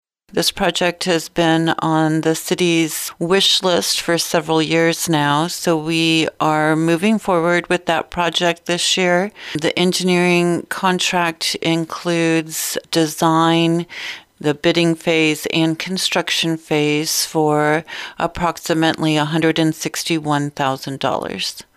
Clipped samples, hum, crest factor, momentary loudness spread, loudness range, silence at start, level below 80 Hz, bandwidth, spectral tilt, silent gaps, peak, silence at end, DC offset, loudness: under 0.1%; none; 12 dB; 6 LU; 2 LU; 0.35 s; -52 dBFS; 16 kHz; -4 dB/octave; none; -4 dBFS; 0.15 s; under 0.1%; -17 LUFS